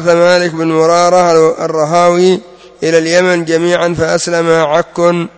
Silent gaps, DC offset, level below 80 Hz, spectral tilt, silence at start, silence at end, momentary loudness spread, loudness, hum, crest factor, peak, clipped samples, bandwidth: none; under 0.1%; -46 dBFS; -5 dB/octave; 0 s; 0.1 s; 5 LU; -10 LUFS; none; 10 dB; 0 dBFS; 0.2%; 8 kHz